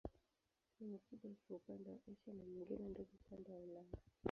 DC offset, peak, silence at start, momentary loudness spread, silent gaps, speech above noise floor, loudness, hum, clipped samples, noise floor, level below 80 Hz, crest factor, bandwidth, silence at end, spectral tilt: under 0.1%; -26 dBFS; 0.05 s; 8 LU; none; 35 dB; -55 LUFS; none; under 0.1%; -89 dBFS; -70 dBFS; 28 dB; 6.8 kHz; 0 s; -8 dB/octave